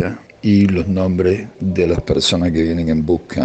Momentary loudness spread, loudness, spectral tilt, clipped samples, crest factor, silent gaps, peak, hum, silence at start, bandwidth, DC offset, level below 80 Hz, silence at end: 7 LU; -16 LUFS; -6 dB/octave; under 0.1%; 12 dB; none; -4 dBFS; none; 0 s; 8.8 kHz; under 0.1%; -36 dBFS; 0 s